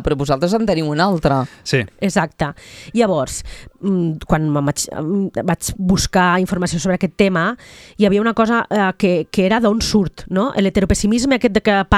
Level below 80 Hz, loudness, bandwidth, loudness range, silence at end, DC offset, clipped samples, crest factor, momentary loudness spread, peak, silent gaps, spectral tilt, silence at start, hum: -36 dBFS; -17 LUFS; 14 kHz; 3 LU; 0 s; under 0.1%; under 0.1%; 16 dB; 7 LU; 0 dBFS; none; -5.5 dB/octave; 0 s; none